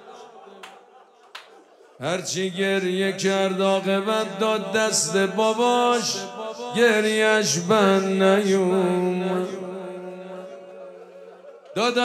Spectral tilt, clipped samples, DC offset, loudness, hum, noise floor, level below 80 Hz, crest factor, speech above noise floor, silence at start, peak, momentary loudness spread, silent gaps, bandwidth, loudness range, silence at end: -4 dB/octave; under 0.1%; under 0.1%; -21 LUFS; none; -52 dBFS; -76 dBFS; 16 dB; 31 dB; 0 s; -6 dBFS; 20 LU; none; 14.5 kHz; 7 LU; 0 s